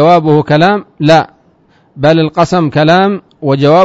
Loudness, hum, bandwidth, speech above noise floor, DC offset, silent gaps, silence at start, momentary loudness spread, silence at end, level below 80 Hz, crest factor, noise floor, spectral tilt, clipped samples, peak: -10 LUFS; none; 7.8 kHz; 41 dB; under 0.1%; none; 0 s; 6 LU; 0 s; -44 dBFS; 10 dB; -49 dBFS; -7 dB/octave; 0.9%; 0 dBFS